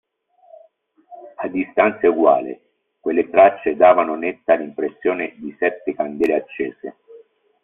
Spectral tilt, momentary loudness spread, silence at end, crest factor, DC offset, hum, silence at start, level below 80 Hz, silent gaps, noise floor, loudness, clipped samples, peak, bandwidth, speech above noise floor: -4 dB/octave; 16 LU; 0.45 s; 18 dB; under 0.1%; none; 1.1 s; -62 dBFS; none; -56 dBFS; -18 LUFS; under 0.1%; -2 dBFS; 3.9 kHz; 38 dB